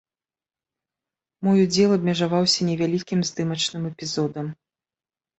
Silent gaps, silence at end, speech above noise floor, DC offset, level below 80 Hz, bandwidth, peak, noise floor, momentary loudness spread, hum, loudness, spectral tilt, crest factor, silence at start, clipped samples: none; 0.85 s; over 68 dB; under 0.1%; -62 dBFS; 8.2 kHz; -6 dBFS; under -90 dBFS; 9 LU; none; -22 LUFS; -5 dB/octave; 18 dB; 1.4 s; under 0.1%